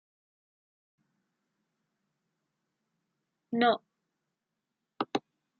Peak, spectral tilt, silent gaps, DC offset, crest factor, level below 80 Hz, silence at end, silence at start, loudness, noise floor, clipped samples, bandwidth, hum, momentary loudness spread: -14 dBFS; -2 dB/octave; none; under 0.1%; 24 dB; -88 dBFS; 0.4 s; 3.5 s; -31 LUFS; -86 dBFS; under 0.1%; 7.2 kHz; none; 10 LU